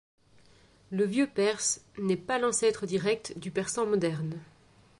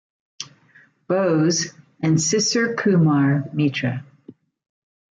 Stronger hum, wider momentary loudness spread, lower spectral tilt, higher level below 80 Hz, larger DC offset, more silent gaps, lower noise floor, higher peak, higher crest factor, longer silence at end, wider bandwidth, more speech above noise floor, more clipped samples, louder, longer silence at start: neither; second, 8 LU vs 17 LU; about the same, -4 dB/octave vs -5 dB/octave; about the same, -66 dBFS vs -62 dBFS; neither; neither; first, -60 dBFS vs -54 dBFS; second, -14 dBFS vs -8 dBFS; about the same, 16 dB vs 14 dB; second, 0.55 s vs 0.85 s; first, 11.5 kHz vs 9.4 kHz; second, 31 dB vs 35 dB; neither; second, -29 LUFS vs -20 LUFS; first, 0.9 s vs 0.4 s